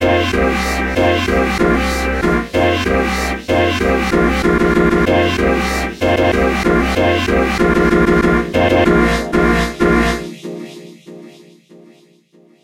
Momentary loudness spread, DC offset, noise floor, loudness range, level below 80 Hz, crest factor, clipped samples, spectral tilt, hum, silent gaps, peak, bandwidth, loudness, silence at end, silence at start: 5 LU; under 0.1%; -50 dBFS; 3 LU; -26 dBFS; 14 dB; under 0.1%; -5.5 dB/octave; none; none; 0 dBFS; 16 kHz; -14 LUFS; 1.35 s; 0 s